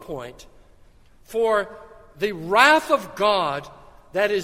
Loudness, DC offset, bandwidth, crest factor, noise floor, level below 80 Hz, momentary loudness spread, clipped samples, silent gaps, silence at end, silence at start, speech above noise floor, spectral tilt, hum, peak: -21 LUFS; under 0.1%; 16 kHz; 22 dB; -51 dBFS; -54 dBFS; 20 LU; under 0.1%; none; 0 s; 0 s; 30 dB; -3.5 dB/octave; none; 0 dBFS